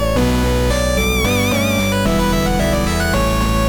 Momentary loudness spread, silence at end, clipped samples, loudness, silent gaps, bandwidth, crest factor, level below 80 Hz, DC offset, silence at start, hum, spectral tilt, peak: 1 LU; 0 s; under 0.1%; -16 LUFS; none; 17.5 kHz; 8 dB; -22 dBFS; under 0.1%; 0 s; none; -5 dB/octave; -6 dBFS